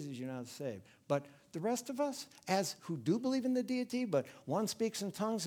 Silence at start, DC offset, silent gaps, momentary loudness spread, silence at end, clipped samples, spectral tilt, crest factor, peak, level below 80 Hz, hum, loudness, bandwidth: 0 s; under 0.1%; none; 9 LU; 0 s; under 0.1%; -5 dB/octave; 20 dB; -18 dBFS; -82 dBFS; none; -37 LUFS; 18 kHz